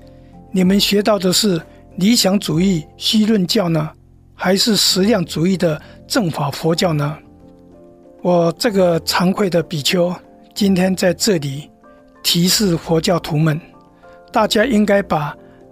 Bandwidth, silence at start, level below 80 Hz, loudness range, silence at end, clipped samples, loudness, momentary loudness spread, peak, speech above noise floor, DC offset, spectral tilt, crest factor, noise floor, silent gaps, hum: 16 kHz; 0.35 s; -46 dBFS; 3 LU; 0.35 s; under 0.1%; -16 LUFS; 10 LU; -2 dBFS; 30 dB; under 0.1%; -4.5 dB/octave; 16 dB; -46 dBFS; none; none